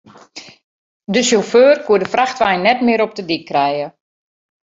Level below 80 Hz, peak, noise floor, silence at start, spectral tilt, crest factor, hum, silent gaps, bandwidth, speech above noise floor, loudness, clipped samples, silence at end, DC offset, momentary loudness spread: -60 dBFS; 0 dBFS; -39 dBFS; 0.35 s; -3.5 dB/octave; 16 dB; none; 0.63-1.00 s; 7.8 kHz; 24 dB; -15 LUFS; under 0.1%; 0.75 s; under 0.1%; 22 LU